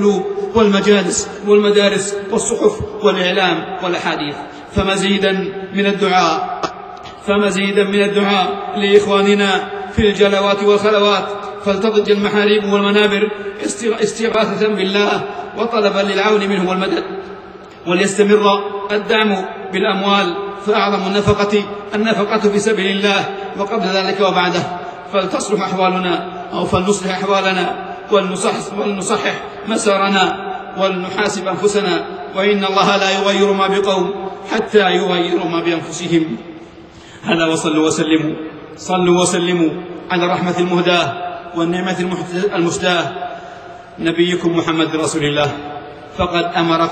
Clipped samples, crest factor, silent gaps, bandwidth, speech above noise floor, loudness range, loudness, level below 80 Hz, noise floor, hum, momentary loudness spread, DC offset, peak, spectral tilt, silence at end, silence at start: under 0.1%; 16 dB; none; 9 kHz; 22 dB; 3 LU; -16 LUFS; -44 dBFS; -38 dBFS; none; 10 LU; under 0.1%; 0 dBFS; -4.5 dB/octave; 0 s; 0 s